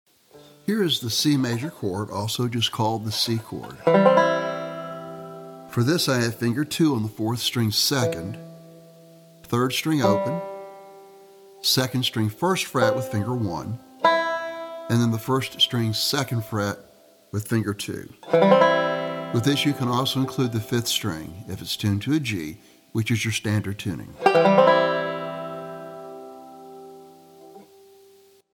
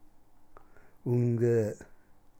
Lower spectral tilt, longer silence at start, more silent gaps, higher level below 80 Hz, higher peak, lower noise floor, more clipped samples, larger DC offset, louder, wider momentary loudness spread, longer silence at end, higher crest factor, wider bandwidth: second, -5 dB/octave vs -9.5 dB/octave; first, 0.35 s vs 0.05 s; neither; about the same, -62 dBFS vs -62 dBFS; first, -2 dBFS vs -18 dBFS; about the same, -54 dBFS vs -55 dBFS; neither; neither; first, -23 LUFS vs -29 LUFS; first, 18 LU vs 14 LU; first, 0.95 s vs 0.45 s; first, 22 dB vs 14 dB; first, 18.5 kHz vs 8.6 kHz